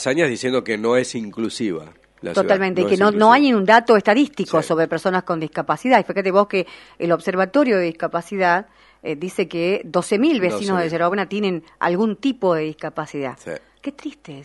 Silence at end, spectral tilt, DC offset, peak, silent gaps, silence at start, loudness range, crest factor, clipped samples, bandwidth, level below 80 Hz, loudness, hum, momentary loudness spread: 0 s; -5.5 dB/octave; under 0.1%; 0 dBFS; none; 0 s; 5 LU; 20 dB; under 0.1%; 11.5 kHz; -62 dBFS; -19 LUFS; none; 15 LU